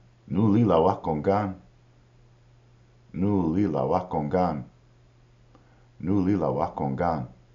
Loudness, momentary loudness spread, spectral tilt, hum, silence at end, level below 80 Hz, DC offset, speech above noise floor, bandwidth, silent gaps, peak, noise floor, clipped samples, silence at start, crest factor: -25 LUFS; 12 LU; -8.5 dB/octave; none; 0.2 s; -52 dBFS; under 0.1%; 32 dB; 7 kHz; none; -6 dBFS; -57 dBFS; under 0.1%; 0.25 s; 20 dB